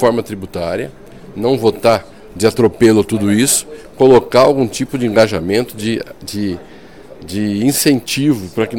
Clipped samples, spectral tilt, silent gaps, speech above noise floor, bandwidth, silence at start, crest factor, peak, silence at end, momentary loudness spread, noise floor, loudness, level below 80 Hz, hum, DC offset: under 0.1%; -4.5 dB/octave; none; 24 dB; 18 kHz; 0 s; 14 dB; 0 dBFS; 0 s; 13 LU; -37 dBFS; -14 LUFS; -44 dBFS; none; 0.8%